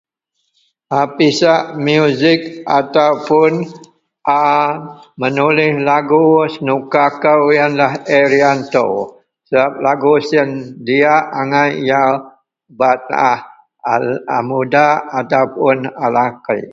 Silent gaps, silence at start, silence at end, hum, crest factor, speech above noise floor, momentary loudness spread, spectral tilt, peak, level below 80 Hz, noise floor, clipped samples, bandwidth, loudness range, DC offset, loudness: none; 0.9 s; 0 s; none; 14 dB; 56 dB; 7 LU; -6 dB/octave; 0 dBFS; -60 dBFS; -69 dBFS; under 0.1%; 7.8 kHz; 3 LU; under 0.1%; -14 LUFS